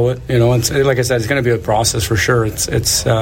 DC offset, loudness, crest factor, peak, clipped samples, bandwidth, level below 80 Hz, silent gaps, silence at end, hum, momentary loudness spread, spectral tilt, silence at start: under 0.1%; -15 LUFS; 14 dB; -2 dBFS; under 0.1%; 16.5 kHz; -32 dBFS; none; 0 s; none; 2 LU; -4.5 dB/octave; 0 s